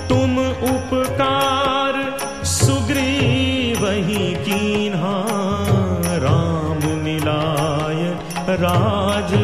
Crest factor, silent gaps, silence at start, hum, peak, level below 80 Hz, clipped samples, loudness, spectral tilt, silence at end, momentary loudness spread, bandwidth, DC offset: 18 dB; none; 0 s; none; -2 dBFS; -34 dBFS; under 0.1%; -19 LUFS; -5 dB/octave; 0 s; 4 LU; 14.5 kHz; 0.8%